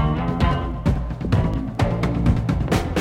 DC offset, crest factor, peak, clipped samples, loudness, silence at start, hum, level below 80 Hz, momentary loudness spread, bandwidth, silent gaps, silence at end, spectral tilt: under 0.1%; 16 dB; -4 dBFS; under 0.1%; -22 LUFS; 0 s; none; -26 dBFS; 3 LU; 15.5 kHz; none; 0 s; -7.5 dB/octave